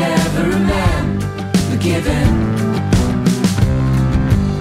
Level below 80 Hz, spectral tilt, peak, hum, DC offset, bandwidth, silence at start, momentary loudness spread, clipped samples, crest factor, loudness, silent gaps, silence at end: -24 dBFS; -6.5 dB/octave; -2 dBFS; none; under 0.1%; 15.5 kHz; 0 s; 3 LU; under 0.1%; 14 dB; -16 LUFS; none; 0 s